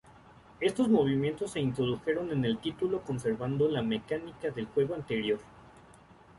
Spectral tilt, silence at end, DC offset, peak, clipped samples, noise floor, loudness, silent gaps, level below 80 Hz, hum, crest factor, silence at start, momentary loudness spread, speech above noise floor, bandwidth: -6.5 dB/octave; 0.6 s; under 0.1%; -12 dBFS; under 0.1%; -56 dBFS; -31 LUFS; none; -60 dBFS; none; 18 dB; 0.6 s; 8 LU; 26 dB; 11.5 kHz